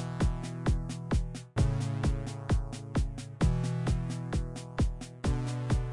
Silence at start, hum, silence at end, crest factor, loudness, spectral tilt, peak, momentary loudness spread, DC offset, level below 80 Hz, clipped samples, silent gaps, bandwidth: 0 s; none; 0 s; 16 dB; -33 LUFS; -6.5 dB/octave; -16 dBFS; 5 LU; under 0.1%; -36 dBFS; under 0.1%; none; 11.5 kHz